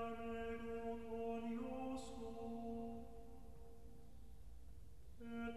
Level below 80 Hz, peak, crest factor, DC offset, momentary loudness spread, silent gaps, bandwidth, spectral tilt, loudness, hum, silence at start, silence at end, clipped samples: -62 dBFS; -36 dBFS; 14 dB; 0.2%; 17 LU; none; 13 kHz; -6.5 dB/octave; -49 LUFS; none; 0 s; 0 s; under 0.1%